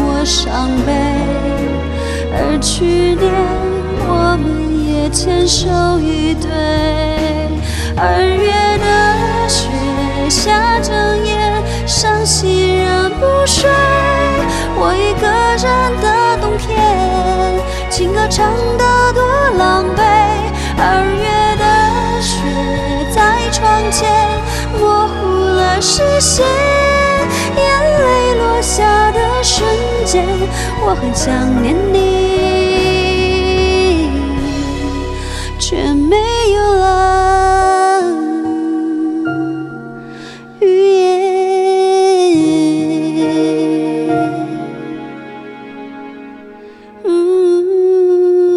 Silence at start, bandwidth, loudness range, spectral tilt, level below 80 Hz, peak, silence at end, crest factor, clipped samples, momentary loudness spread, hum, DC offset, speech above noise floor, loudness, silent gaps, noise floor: 0 s; 14 kHz; 3 LU; -4.5 dB/octave; -24 dBFS; 0 dBFS; 0 s; 12 dB; under 0.1%; 7 LU; none; under 0.1%; 23 dB; -13 LUFS; none; -35 dBFS